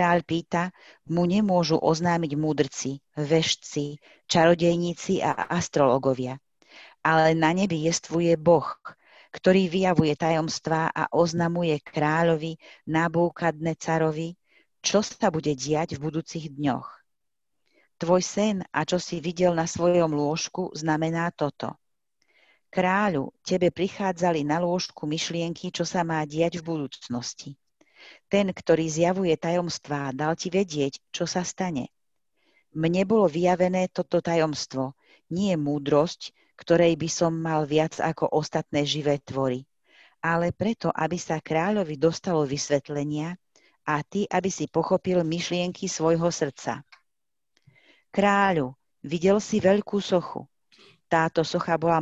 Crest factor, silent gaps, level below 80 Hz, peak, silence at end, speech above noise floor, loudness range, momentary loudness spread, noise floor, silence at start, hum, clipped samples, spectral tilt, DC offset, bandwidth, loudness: 20 dB; none; -58 dBFS; -4 dBFS; 0 s; 62 dB; 4 LU; 11 LU; -87 dBFS; 0 s; none; under 0.1%; -5 dB/octave; under 0.1%; 8.2 kHz; -25 LUFS